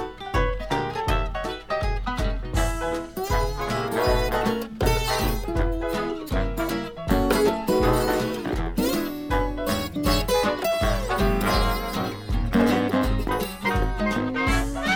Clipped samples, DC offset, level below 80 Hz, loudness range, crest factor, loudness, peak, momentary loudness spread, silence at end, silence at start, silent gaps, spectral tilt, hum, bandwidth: under 0.1%; under 0.1%; -30 dBFS; 3 LU; 16 dB; -25 LUFS; -8 dBFS; 6 LU; 0 s; 0 s; none; -5.5 dB/octave; none; 18 kHz